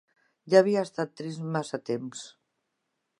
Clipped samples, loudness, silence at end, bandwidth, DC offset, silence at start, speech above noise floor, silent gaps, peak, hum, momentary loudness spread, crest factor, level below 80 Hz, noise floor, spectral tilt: under 0.1%; -27 LUFS; 0.9 s; 11 kHz; under 0.1%; 0.45 s; 54 dB; none; -6 dBFS; none; 18 LU; 24 dB; -82 dBFS; -80 dBFS; -6 dB/octave